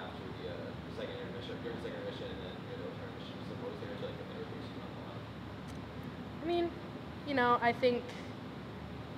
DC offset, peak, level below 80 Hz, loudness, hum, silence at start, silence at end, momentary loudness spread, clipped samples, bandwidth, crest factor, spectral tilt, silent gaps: under 0.1%; -16 dBFS; -60 dBFS; -39 LUFS; none; 0 s; 0 s; 14 LU; under 0.1%; 15.5 kHz; 22 dB; -6.5 dB/octave; none